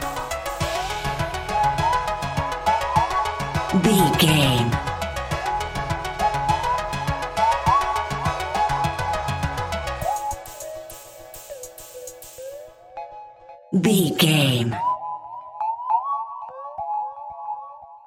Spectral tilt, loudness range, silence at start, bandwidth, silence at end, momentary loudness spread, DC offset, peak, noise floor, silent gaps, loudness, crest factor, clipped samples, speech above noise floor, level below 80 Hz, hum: -4.5 dB/octave; 10 LU; 0 s; 17 kHz; 0.05 s; 20 LU; under 0.1%; -4 dBFS; -44 dBFS; none; -22 LUFS; 20 dB; under 0.1%; 27 dB; -40 dBFS; none